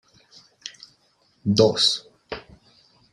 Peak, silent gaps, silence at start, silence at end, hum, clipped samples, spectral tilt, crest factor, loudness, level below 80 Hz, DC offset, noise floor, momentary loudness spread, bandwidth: -2 dBFS; none; 0.65 s; 0.75 s; none; under 0.1%; -4.5 dB/octave; 24 dB; -20 LUFS; -60 dBFS; under 0.1%; -64 dBFS; 22 LU; 12 kHz